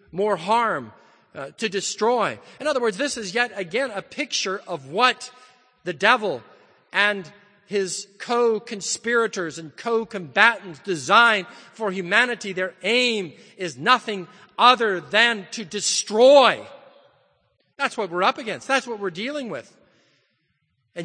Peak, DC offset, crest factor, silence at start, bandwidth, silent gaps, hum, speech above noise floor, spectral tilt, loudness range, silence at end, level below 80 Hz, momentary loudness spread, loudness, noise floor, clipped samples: 0 dBFS; under 0.1%; 22 dB; 0.15 s; 9.8 kHz; none; none; 49 dB; -2.5 dB/octave; 6 LU; 0 s; -72 dBFS; 15 LU; -21 LUFS; -71 dBFS; under 0.1%